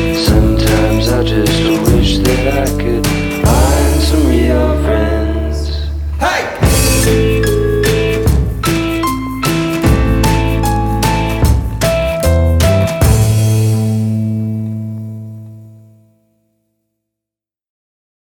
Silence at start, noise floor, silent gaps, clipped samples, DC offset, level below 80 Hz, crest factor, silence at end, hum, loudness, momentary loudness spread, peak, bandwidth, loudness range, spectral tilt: 0 s; -86 dBFS; none; under 0.1%; under 0.1%; -18 dBFS; 12 dB; 2.5 s; none; -13 LUFS; 7 LU; 0 dBFS; 18.5 kHz; 6 LU; -5.5 dB/octave